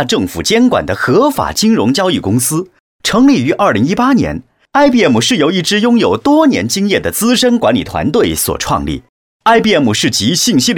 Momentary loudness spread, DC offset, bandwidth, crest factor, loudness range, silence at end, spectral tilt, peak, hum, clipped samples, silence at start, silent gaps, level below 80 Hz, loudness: 6 LU; under 0.1%; 18.5 kHz; 12 dB; 2 LU; 0 s; -4 dB/octave; 0 dBFS; none; under 0.1%; 0 s; 2.80-2.99 s, 9.09-9.40 s; -38 dBFS; -11 LUFS